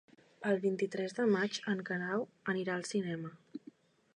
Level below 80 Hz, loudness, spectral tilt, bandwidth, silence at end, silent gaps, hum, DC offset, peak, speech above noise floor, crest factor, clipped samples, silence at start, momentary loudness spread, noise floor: -82 dBFS; -35 LUFS; -5.5 dB/octave; 10.5 kHz; 0.6 s; none; none; under 0.1%; -20 dBFS; 24 dB; 16 dB; under 0.1%; 0.4 s; 14 LU; -59 dBFS